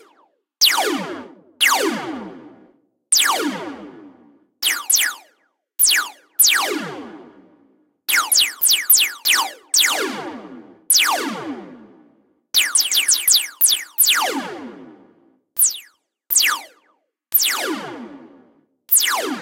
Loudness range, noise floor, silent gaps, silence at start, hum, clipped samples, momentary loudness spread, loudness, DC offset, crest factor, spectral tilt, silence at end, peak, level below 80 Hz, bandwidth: 4 LU; -64 dBFS; none; 0.6 s; none; under 0.1%; 20 LU; -16 LUFS; under 0.1%; 20 dB; 1 dB/octave; 0 s; -2 dBFS; -74 dBFS; 16.5 kHz